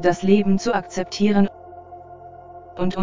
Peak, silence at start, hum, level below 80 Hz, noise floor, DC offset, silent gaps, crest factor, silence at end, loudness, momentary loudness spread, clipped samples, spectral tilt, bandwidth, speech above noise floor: -4 dBFS; 0 s; none; -50 dBFS; -41 dBFS; under 0.1%; none; 16 dB; 0 s; -20 LUFS; 24 LU; under 0.1%; -6.5 dB/octave; 7.6 kHz; 22 dB